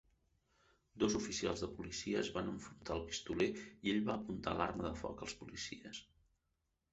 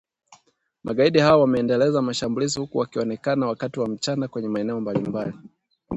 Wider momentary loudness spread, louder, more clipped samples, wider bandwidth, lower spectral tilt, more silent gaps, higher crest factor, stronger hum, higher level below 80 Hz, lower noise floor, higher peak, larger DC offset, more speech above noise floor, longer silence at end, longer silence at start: about the same, 9 LU vs 10 LU; second, -41 LUFS vs -23 LUFS; neither; about the same, 8 kHz vs 8.2 kHz; second, -4 dB/octave vs -5.5 dB/octave; neither; about the same, 24 dB vs 20 dB; neither; about the same, -60 dBFS vs -56 dBFS; first, -85 dBFS vs -61 dBFS; second, -18 dBFS vs -2 dBFS; neither; first, 44 dB vs 39 dB; first, 0.9 s vs 0 s; first, 0.95 s vs 0.3 s